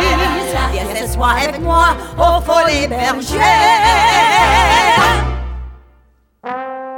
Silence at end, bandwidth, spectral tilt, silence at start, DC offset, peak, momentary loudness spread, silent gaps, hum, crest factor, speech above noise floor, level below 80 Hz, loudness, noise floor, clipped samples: 0 s; 18 kHz; -3.5 dB/octave; 0 s; under 0.1%; 0 dBFS; 15 LU; none; none; 12 dB; 41 dB; -24 dBFS; -12 LUFS; -52 dBFS; under 0.1%